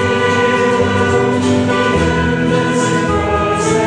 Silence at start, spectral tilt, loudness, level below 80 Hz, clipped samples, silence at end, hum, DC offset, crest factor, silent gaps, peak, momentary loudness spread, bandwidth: 0 s; -5.5 dB/octave; -14 LUFS; -32 dBFS; under 0.1%; 0 s; none; under 0.1%; 12 dB; none; -2 dBFS; 2 LU; 10.5 kHz